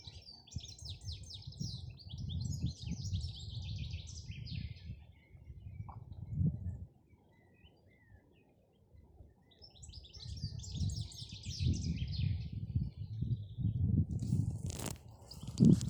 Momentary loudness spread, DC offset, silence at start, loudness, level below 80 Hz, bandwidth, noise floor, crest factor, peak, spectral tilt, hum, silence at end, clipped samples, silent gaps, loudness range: 16 LU; under 0.1%; 0 s; -40 LUFS; -50 dBFS; over 20 kHz; -68 dBFS; 26 dB; -14 dBFS; -6.5 dB/octave; none; 0 s; under 0.1%; none; 13 LU